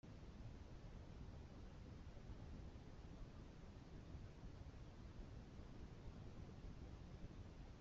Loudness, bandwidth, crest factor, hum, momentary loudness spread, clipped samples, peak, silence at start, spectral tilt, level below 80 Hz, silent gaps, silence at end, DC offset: -59 LUFS; 7.4 kHz; 14 dB; none; 2 LU; under 0.1%; -42 dBFS; 0.05 s; -7 dB/octave; -60 dBFS; none; 0 s; under 0.1%